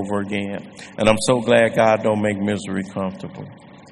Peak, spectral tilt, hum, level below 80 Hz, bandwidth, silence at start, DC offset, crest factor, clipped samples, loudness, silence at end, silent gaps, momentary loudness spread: 0 dBFS; -5 dB/octave; none; -48 dBFS; 11.5 kHz; 0 s; under 0.1%; 20 dB; under 0.1%; -19 LUFS; 0.15 s; none; 19 LU